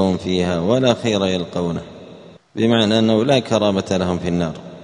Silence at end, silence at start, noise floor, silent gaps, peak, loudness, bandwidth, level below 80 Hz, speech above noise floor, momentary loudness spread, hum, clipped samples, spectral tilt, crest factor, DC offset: 0 s; 0 s; -41 dBFS; none; 0 dBFS; -18 LUFS; 10.5 kHz; -48 dBFS; 24 dB; 10 LU; none; under 0.1%; -6 dB/octave; 18 dB; under 0.1%